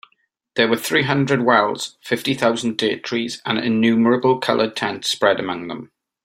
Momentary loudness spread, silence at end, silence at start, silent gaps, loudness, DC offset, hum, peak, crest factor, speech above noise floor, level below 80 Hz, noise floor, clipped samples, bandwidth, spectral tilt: 9 LU; 0.4 s; 0.55 s; none; -19 LUFS; under 0.1%; none; -2 dBFS; 18 dB; 46 dB; -60 dBFS; -65 dBFS; under 0.1%; 16 kHz; -4.5 dB/octave